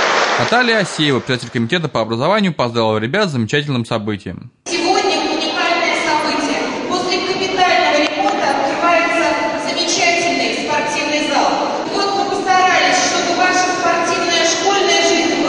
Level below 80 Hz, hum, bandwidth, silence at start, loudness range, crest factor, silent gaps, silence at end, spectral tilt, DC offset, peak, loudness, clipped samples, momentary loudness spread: -56 dBFS; none; 11 kHz; 0 s; 3 LU; 14 dB; none; 0 s; -3 dB/octave; under 0.1%; -2 dBFS; -15 LUFS; under 0.1%; 6 LU